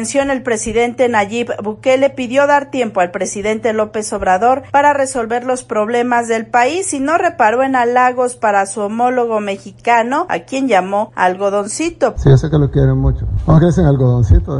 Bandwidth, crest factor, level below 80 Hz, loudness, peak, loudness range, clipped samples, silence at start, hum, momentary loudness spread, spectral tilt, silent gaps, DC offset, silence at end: 11.5 kHz; 14 dB; -28 dBFS; -14 LUFS; 0 dBFS; 2 LU; under 0.1%; 0 s; none; 7 LU; -6 dB/octave; none; under 0.1%; 0 s